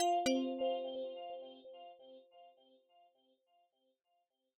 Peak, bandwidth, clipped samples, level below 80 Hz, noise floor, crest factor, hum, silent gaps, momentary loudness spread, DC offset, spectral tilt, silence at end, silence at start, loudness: -24 dBFS; 8 kHz; under 0.1%; -84 dBFS; -83 dBFS; 18 dB; none; none; 24 LU; under 0.1%; -1.5 dB/octave; 2.1 s; 0 s; -39 LUFS